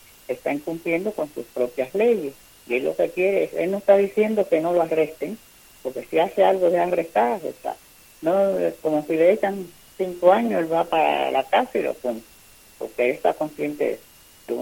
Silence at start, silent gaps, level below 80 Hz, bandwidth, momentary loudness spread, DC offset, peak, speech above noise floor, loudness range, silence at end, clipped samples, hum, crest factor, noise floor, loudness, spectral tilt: 0.3 s; none; -62 dBFS; 17 kHz; 15 LU; under 0.1%; -4 dBFS; 28 dB; 3 LU; 0 s; under 0.1%; none; 20 dB; -50 dBFS; -22 LUFS; -5.5 dB/octave